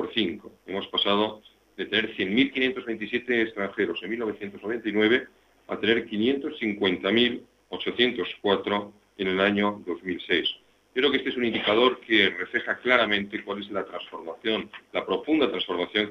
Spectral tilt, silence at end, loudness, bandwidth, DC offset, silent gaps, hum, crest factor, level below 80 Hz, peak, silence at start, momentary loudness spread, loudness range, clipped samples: -6 dB/octave; 0 s; -26 LUFS; 6.8 kHz; under 0.1%; none; none; 22 dB; -64 dBFS; -6 dBFS; 0 s; 11 LU; 3 LU; under 0.1%